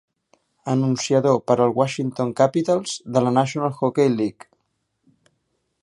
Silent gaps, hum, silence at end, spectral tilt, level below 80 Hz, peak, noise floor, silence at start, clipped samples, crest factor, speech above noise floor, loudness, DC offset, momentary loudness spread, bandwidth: none; none; 1.5 s; -6 dB/octave; -66 dBFS; -2 dBFS; -73 dBFS; 0.65 s; under 0.1%; 20 dB; 53 dB; -21 LUFS; under 0.1%; 6 LU; 11.5 kHz